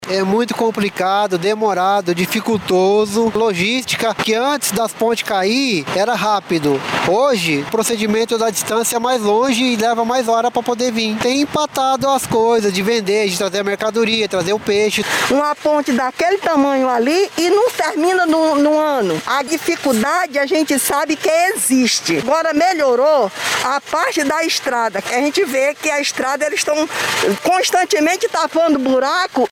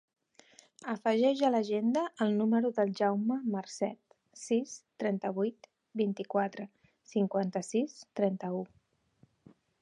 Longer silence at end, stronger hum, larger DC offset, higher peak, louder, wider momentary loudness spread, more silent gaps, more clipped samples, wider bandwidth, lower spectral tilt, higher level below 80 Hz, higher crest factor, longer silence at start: second, 0.05 s vs 1.15 s; neither; neither; first, -2 dBFS vs -16 dBFS; first, -16 LUFS vs -32 LUFS; second, 4 LU vs 11 LU; neither; neither; first, 17.5 kHz vs 11 kHz; second, -3.5 dB/octave vs -6 dB/octave; first, -56 dBFS vs -84 dBFS; about the same, 14 dB vs 16 dB; second, 0 s vs 0.8 s